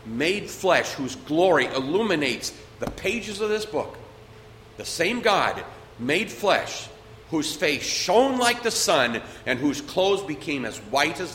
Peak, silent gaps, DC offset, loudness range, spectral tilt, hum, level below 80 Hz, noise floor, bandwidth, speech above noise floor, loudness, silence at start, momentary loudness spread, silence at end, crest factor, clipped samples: -4 dBFS; none; under 0.1%; 4 LU; -3 dB/octave; none; -54 dBFS; -46 dBFS; 16.5 kHz; 22 dB; -24 LUFS; 0 s; 13 LU; 0 s; 20 dB; under 0.1%